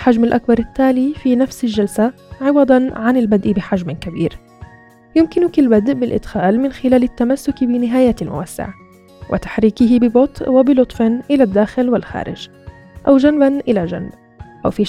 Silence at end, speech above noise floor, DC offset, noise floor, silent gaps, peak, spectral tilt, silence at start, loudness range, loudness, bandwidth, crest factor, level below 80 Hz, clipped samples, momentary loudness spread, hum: 0 s; 29 dB; under 0.1%; -44 dBFS; none; 0 dBFS; -7 dB/octave; 0 s; 3 LU; -15 LUFS; 13 kHz; 14 dB; -40 dBFS; under 0.1%; 12 LU; none